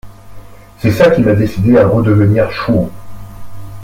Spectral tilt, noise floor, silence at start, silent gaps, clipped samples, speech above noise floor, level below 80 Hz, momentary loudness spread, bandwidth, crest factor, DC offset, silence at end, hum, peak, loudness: -8.5 dB/octave; -32 dBFS; 0.05 s; none; under 0.1%; 22 dB; -36 dBFS; 8 LU; 16 kHz; 12 dB; under 0.1%; 0 s; 50 Hz at -25 dBFS; 0 dBFS; -11 LUFS